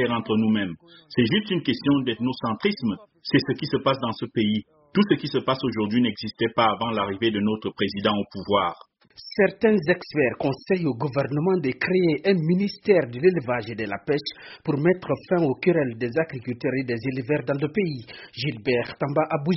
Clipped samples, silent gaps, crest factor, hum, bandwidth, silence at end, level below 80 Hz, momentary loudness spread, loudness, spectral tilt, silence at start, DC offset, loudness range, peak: under 0.1%; none; 18 dB; none; 6 kHz; 0 s; -60 dBFS; 7 LU; -24 LUFS; -5 dB/octave; 0 s; under 0.1%; 2 LU; -6 dBFS